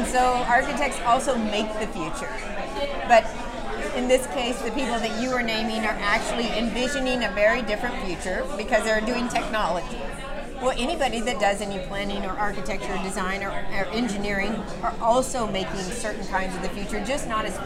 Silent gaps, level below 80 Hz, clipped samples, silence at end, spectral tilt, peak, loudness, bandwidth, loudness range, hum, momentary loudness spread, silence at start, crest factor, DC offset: none; -36 dBFS; under 0.1%; 0 s; -3.5 dB/octave; -6 dBFS; -25 LUFS; 15.5 kHz; 3 LU; none; 9 LU; 0 s; 20 dB; under 0.1%